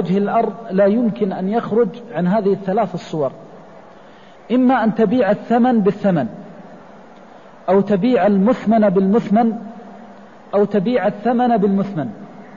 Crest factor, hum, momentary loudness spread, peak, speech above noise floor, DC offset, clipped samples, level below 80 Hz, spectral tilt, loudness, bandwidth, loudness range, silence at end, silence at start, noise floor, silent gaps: 12 dB; none; 10 LU; -6 dBFS; 27 dB; 0.3%; under 0.1%; -56 dBFS; -9 dB/octave; -17 LUFS; 7.2 kHz; 3 LU; 0 s; 0 s; -43 dBFS; none